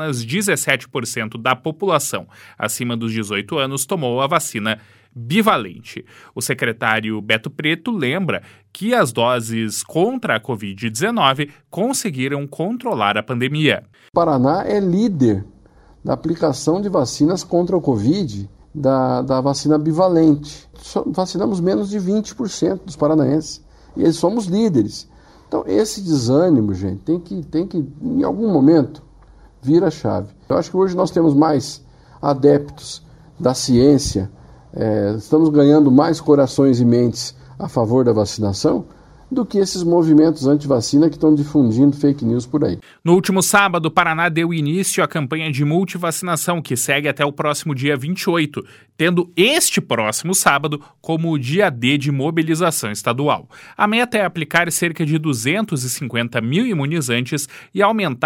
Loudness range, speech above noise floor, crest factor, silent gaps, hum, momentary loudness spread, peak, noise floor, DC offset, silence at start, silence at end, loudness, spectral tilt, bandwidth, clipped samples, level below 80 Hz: 5 LU; 30 dB; 18 dB; none; none; 10 LU; 0 dBFS; -48 dBFS; under 0.1%; 0 s; 0 s; -18 LUFS; -5 dB/octave; 16.5 kHz; under 0.1%; -50 dBFS